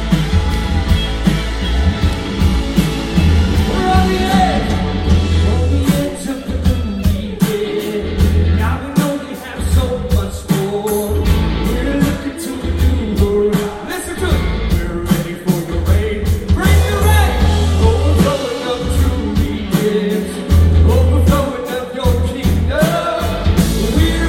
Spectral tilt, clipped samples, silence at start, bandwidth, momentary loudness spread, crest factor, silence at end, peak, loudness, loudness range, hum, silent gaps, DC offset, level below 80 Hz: -6 dB/octave; under 0.1%; 0 s; 16.5 kHz; 6 LU; 12 dB; 0 s; -2 dBFS; -16 LUFS; 3 LU; none; none; under 0.1%; -20 dBFS